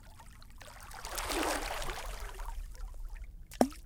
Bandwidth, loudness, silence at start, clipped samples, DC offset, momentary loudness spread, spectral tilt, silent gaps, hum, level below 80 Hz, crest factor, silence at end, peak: 18 kHz; -38 LUFS; 0 s; under 0.1%; under 0.1%; 19 LU; -3.5 dB/octave; none; none; -44 dBFS; 32 dB; 0 s; -6 dBFS